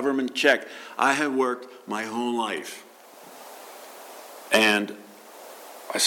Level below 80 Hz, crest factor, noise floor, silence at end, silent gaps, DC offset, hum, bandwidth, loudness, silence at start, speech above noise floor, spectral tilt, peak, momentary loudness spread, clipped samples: -74 dBFS; 20 dB; -47 dBFS; 0 s; none; under 0.1%; none; 17.5 kHz; -24 LUFS; 0 s; 23 dB; -2 dB/octave; -6 dBFS; 23 LU; under 0.1%